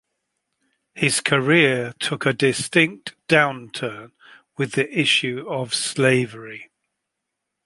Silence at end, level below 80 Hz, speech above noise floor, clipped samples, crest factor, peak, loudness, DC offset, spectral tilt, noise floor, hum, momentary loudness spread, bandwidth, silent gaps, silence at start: 1 s; -64 dBFS; 59 dB; under 0.1%; 20 dB; -2 dBFS; -20 LUFS; under 0.1%; -4 dB/octave; -81 dBFS; none; 16 LU; 11.5 kHz; none; 0.95 s